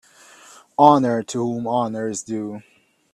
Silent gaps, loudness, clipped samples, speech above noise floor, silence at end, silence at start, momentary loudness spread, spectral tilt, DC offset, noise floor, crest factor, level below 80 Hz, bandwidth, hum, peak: none; -20 LUFS; under 0.1%; 29 dB; 0.55 s; 0.8 s; 17 LU; -5.5 dB/octave; under 0.1%; -48 dBFS; 20 dB; -66 dBFS; 12.5 kHz; none; 0 dBFS